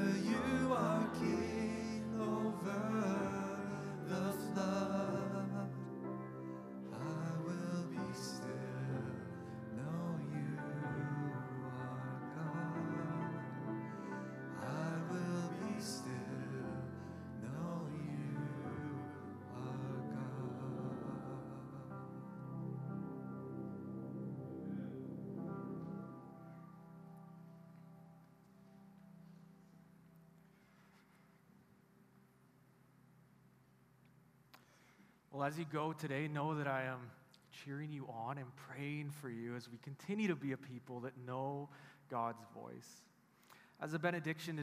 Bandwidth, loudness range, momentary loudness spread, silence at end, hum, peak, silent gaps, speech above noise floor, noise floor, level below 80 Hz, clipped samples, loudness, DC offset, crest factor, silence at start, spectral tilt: 14 kHz; 12 LU; 16 LU; 0 s; none; -22 dBFS; none; 26 dB; -69 dBFS; -78 dBFS; under 0.1%; -43 LUFS; under 0.1%; 22 dB; 0 s; -6.5 dB/octave